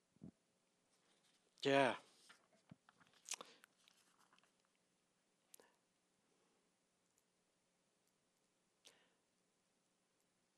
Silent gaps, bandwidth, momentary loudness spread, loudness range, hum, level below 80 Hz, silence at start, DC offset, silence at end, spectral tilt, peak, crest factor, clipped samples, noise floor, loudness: none; 13 kHz; 27 LU; 14 LU; none; under -90 dBFS; 0.25 s; under 0.1%; 7.25 s; -3.5 dB/octave; -22 dBFS; 28 dB; under 0.1%; -84 dBFS; -41 LUFS